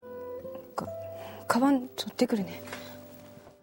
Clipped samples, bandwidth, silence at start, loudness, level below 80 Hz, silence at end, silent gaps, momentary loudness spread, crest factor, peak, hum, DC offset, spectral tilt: under 0.1%; 16.5 kHz; 0.05 s; -31 LUFS; -70 dBFS; 0.1 s; none; 21 LU; 26 dB; -6 dBFS; none; under 0.1%; -5 dB/octave